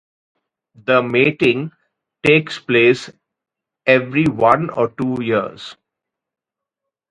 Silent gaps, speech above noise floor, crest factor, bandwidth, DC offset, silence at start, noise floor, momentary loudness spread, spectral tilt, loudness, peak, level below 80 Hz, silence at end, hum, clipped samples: none; 67 dB; 18 dB; 11 kHz; under 0.1%; 0.85 s; -83 dBFS; 15 LU; -6.5 dB/octave; -16 LUFS; 0 dBFS; -56 dBFS; 1.4 s; none; under 0.1%